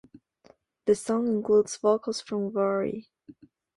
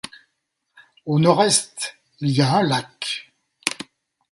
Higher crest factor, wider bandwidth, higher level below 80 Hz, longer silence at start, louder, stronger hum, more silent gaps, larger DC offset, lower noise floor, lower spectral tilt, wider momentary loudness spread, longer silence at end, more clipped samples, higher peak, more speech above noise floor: about the same, 18 dB vs 22 dB; about the same, 11.5 kHz vs 12 kHz; about the same, -68 dBFS vs -64 dBFS; second, 0.85 s vs 1.05 s; second, -27 LUFS vs -21 LUFS; neither; neither; neither; second, -61 dBFS vs -75 dBFS; about the same, -5.5 dB/octave vs -4.5 dB/octave; second, 9 LU vs 18 LU; first, 0.75 s vs 0.5 s; neither; second, -10 dBFS vs 0 dBFS; second, 35 dB vs 56 dB